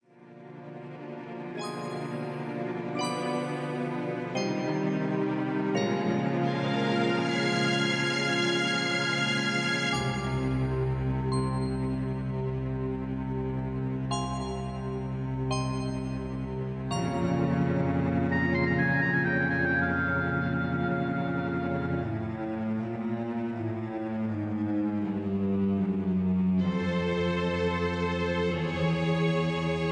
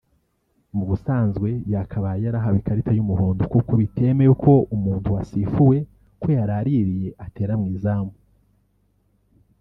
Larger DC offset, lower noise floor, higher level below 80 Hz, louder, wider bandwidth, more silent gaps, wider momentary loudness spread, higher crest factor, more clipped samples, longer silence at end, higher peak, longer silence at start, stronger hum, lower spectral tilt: neither; second, -50 dBFS vs -67 dBFS; about the same, -48 dBFS vs -44 dBFS; second, -29 LUFS vs -21 LUFS; first, 10.5 kHz vs 3.6 kHz; neither; second, 8 LU vs 11 LU; about the same, 16 dB vs 18 dB; neither; second, 0 s vs 1.5 s; second, -14 dBFS vs -4 dBFS; second, 0.2 s vs 0.75 s; neither; second, -6 dB/octave vs -12 dB/octave